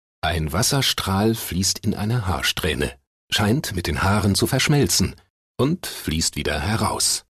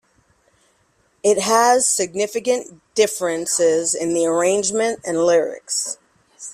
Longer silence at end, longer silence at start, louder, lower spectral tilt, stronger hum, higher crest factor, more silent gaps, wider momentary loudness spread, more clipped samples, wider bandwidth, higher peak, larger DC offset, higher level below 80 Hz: about the same, 0.1 s vs 0 s; second, 0.25 s vs 1.25 s; about the same, -21 LUFS vs -19 LUFS; first, -4 dB/octave vs -2.5 dB/octave; neither; second, 12 dB vs 18 dB; first, 3.07-3.28 s, 5.30-5.55 s vs none; about the same, 7 LU vs 8 LU; neither; second, 13.5 kHz vs 15 kHz; second, -8 dBFS vs -2 dBFS; neither; first, -38 dBFS vs -64 dBFS